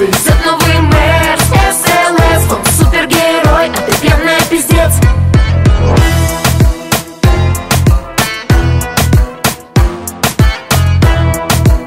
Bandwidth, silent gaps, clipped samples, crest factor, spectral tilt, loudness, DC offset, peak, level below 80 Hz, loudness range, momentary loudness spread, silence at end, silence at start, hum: 16.5 kHz; none; under 0.1%; 8 dB; -4.5 dB/octave; -10 LUFS; 0.2%; 0 dBFS; -14 dBFS; 3 LU; 4 LU; 0 s; 0 s; none